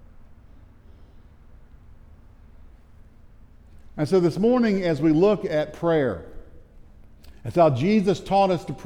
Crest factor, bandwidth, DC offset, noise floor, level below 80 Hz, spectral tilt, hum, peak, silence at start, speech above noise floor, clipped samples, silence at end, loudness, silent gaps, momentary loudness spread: 18 dB; 12.5 kHz; under 0.1%; -48 dBFS; -48 dBFS; -7.5 dB/octave; none; -6 dBFS; 0.25 s; 28 dB; under 0.1%; 0 s; -21 LUFS; none; 9 LU